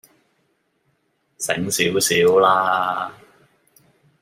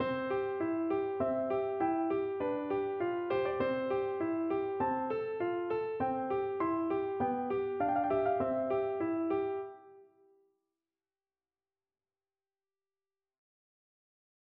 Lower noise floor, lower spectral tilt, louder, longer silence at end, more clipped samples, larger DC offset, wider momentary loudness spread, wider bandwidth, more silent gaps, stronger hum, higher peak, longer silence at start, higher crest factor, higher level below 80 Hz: second, -67 dBFS vs under -90 dBFS; second, -3 dB/octave vs -5.5 dB/octave; first, -18 LUFS vs -34 LUFS; second, 1.1 s vs 4.5 s; neither; neither; first, 13 LU vs 3 LU; first, 16 kHz vs 5.2 kHz; neither; neither; first, -2 dBFS vs -20 dBFS; first, 1.4 s vs 0 s; about the same, 20 dB vs 16 dB; about the same, -64 dBFS vs -68 dBFS